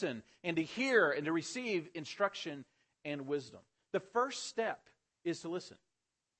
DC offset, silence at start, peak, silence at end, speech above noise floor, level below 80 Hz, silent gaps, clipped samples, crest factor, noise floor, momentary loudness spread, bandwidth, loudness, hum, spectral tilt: under 0.1%; 0 s; -16 dBFS; 0.65 s; 51 dB; -84 dBFS; none; under 0.1%; 22 dB; -88 dBFS; 14 LU; 8.4 kHz; -37 LUFS; none; -4 dB/octave